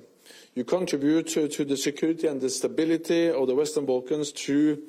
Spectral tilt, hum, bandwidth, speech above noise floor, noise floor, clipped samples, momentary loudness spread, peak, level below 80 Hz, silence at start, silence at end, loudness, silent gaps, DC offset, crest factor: -4.5 dB/octave; none; 15 kHz; 27 dB; -52 dBFS; under 0.1%; 5 LU; -14 dBFS; -72 dBFS; 0.3 s; 0 s; -26 LUFS; none; under 0.1%; 12 dB